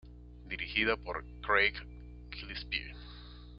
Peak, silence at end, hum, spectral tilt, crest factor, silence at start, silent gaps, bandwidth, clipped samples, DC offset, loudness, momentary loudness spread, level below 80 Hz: -12 dBFS; 0 s; 60 Hz at -50 dBFS; -1 dB/octave; 24 dB; 0.05 s; none; 5.6 kHz; under 0.1%; under 0.1%; -33 LUFS; 23 LU; -50 dBFS